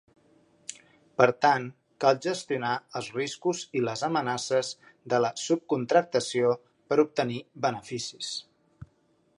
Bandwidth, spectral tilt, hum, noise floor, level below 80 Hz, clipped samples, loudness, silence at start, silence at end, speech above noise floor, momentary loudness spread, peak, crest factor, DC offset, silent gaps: 11.5 kHz; -4.5 dB/octave; none; -67 dBFS; -70 dBFS; under 0.1%; -28 LUFS; 0.7 s; 0.55 s; 40 dB; 13 LU; -4 dBFS; 26 dB; under 0.1%; none